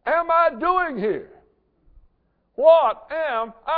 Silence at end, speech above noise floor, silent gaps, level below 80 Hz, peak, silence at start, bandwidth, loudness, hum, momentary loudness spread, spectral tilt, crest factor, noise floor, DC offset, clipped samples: 0 s; 46 dB; none; -56 dBFS; -4 dBFS; 0.05 s; 4.8 kHz; -20 LUFS; none; 12 LU; -8 dB/octave; 18 dB; -67 dBFS; under 0.1%; under 0.1%